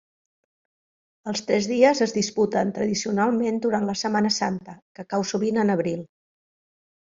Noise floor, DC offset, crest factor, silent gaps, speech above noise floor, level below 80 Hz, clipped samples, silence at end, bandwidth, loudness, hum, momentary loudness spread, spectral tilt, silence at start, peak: under -90 dBFS; under 0.1%; 20 dB; 4.82-4.95 s; over 67 dB; -64 dBFS; under 0.1%; 1 s; 7.6 kHz; -23 LUFS; none; 12 LU; -4.5 dB/octave; 1.25 s; -4 dBFS